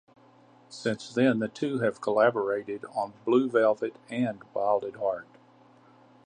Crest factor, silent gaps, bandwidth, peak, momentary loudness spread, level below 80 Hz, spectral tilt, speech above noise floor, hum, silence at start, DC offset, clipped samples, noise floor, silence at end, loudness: 20 dB; none; 9.8 kHz; -10 dBFS; 10 LU; -76 dBFS; -6.5 dB/octave; 30 dB; none; 0.7 s; under 0.1%; under 0.1%; -57 dBFS; 1.05 s; -28 LUFS